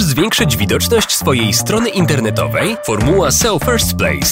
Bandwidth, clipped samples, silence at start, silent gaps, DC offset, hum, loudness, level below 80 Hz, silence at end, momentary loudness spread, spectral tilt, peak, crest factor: 16.5 kHz; under 0.1%; 0 s; none; 0.2%; none; -13 LUFS; -30 dBFS; 0 s; 4 LU; -4 dB/octave; 0 dBFS; 12 dB